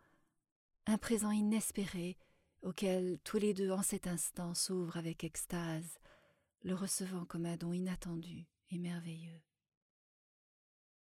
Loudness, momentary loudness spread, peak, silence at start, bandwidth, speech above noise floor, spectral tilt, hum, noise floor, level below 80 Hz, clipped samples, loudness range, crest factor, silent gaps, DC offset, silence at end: -39 LUFS; 13 LU; -22 dBFS; 0.85 s; 17.5 kHz; 36 dB; -4.5 dB/octave; none; -75 dBFS; -64 dBFS; under 0.1%; 7 LU; 18 dB; none; under 0.1%; 1.7 s